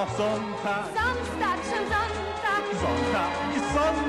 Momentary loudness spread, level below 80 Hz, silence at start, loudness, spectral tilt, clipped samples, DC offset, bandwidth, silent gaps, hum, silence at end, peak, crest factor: 4 LU; -44 dBFS; 0 s; -27 LUFS; -5 dB/octave; under 0.1%; under 0.1%; 13 kHz; none; none; 0 s; -14 dBFS; 12 dB